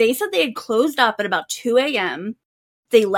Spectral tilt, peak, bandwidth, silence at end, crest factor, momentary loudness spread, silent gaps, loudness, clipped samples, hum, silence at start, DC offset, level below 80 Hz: -3 dB/octave; -2 dBFS; 17.5 kHz; 0 s; 18 dB; 6 LU; 2.45-2.83 s; -19 LUFS; under 0.1%; none; 0 s; under 0.1%; -70 dBFS